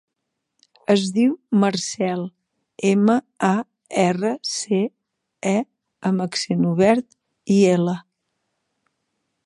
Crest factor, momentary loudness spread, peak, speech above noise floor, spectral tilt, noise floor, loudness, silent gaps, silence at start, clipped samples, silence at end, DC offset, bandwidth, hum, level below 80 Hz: 18 dB; 11 LU; -2 dBFS; 60 dB; -5.5 dB/octave; -79 dBFS; -21 LUFS; none; 0.9 s; under 0.1%; 1.45 s; under 0.1%; 11 kHz; none; -66 dBFS